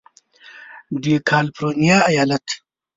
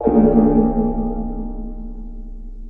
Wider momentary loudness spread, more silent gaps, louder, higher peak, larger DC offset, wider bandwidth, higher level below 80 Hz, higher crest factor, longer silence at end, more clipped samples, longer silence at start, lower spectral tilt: second, 15 LU vs 23 LU; neither; about the same, -18 LUFS vs -17 LUFS; about the same, -2 dBFS vs -2 dBFS; second, under 0.1% vs 0.3%; first, 7.8 kHz vs 2.6 kHz; second, -58 dBFS vs -28 dBFS; about the same, 18 dB vs 16 dB; first, 0.4 s vs 0 s; neither; first, 0.55 s vs 0 s; second, -5 dB/octave vs -13.5 dB/octave